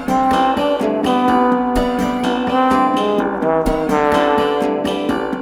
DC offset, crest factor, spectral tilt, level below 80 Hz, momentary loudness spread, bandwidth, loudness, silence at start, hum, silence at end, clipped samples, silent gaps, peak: under 0.1%; 14 dB; -5.5 dB/octave; -36 dBFS; 4 LU; 16 kHz; -16 LUFS; 0 s; none; 0 s; under 0.1%; none; -2 dBFS